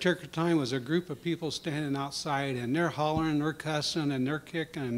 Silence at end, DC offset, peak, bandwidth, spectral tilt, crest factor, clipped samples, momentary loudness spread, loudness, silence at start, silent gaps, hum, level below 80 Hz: 0 s; under 0.1%; -12 dBFS; 16 kHz; -5.5 dB/octave; 18 dB; under 0.1%; 5 LU; -31 LUFS; 0 s; none; none; -60 dBFS